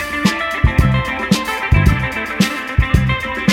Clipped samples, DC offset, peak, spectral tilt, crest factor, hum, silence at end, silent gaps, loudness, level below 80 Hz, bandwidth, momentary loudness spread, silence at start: under 0.1%; under 0.1%; -2 dBFS; -5.5 dB/octave; 14 dB; none; 0 s; none; -16 LUFS; -22 dBFS; 17 kHz; 4 LU; 0 s